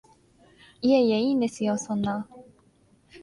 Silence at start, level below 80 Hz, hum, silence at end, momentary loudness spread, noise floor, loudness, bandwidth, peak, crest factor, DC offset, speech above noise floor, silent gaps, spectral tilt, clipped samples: 0.8 s; -62 dBFS; none; 0.05 s; 10 LU; -61 dBFS; -25 LUFS; 11.5 kHz; -10 dBFS; 18 dB; under 0.1%; 38 dB; none; -5.5 dB/octave; under 0.1%